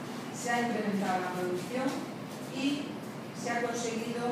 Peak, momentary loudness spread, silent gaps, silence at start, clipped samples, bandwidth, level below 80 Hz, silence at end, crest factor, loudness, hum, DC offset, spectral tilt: -18 dBFS; 9 LU; none; 0 s; under 0.1%; 16 kHz; -78 dBFS; 0 s; 14 dB; -34 LUFS; none; under 0.1%; -4.5 dB/octave